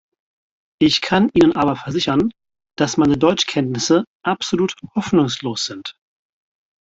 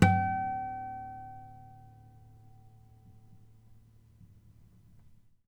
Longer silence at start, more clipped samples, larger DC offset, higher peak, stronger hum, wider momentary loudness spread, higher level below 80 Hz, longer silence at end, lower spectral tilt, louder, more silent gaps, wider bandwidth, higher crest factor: first, 0.8 s vs 0 s; neither; neither; first, -2 dBFS vs -6 dBFS; neither; second, 9 LU vs 28 LU; first, -50 dBFS vs -58 dBFS; second, 0.9 s vs 2.1 s; second, -5 dB/octave vs -7 dB/octave; first, -18 LUFS vs -34 LUFS; first, 4.07-4.20 s vs none; second, 8 kHz vs 11 kHz; second, 16 dB vs 28 dB